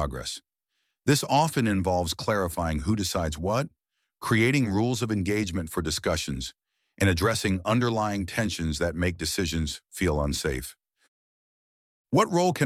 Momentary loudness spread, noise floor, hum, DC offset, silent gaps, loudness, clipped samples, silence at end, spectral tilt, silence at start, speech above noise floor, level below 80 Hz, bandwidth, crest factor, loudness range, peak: 9 LU; -79 dBFS; none; under 0.1%; 11.08-12.05 s; -26 LUFS; under 0.1%; 0 s; -5 dB/octave; 0 s; 53 dB; -42 dBFS; 16.5 kHz; 18 dB; 3 LU; -8 dBFS